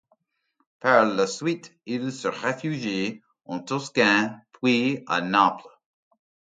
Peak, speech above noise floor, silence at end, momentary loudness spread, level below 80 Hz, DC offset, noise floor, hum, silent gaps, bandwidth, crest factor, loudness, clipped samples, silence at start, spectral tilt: -2 dBFS; 49 dB; 0.9 s; 13 LU; -70 dBFS; under 0.1%; -73 dBFS; none; none; 9.4 kHz; 24 dB; -24 LUFS; under 0.1%; 0.85 s; -4.5 dB/octave